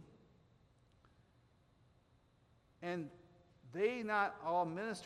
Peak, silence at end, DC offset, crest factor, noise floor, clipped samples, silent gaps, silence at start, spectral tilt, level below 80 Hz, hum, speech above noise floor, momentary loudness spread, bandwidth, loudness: -22 dBFS; 0 s; under 0.1%; 20 dB; -72 dBFS; under 0.1%; none; 0 s; -5.5 dB/octave; -78 dBFS; none; 33 dB; 13 LU; 12.5 kHz; -39 LUFS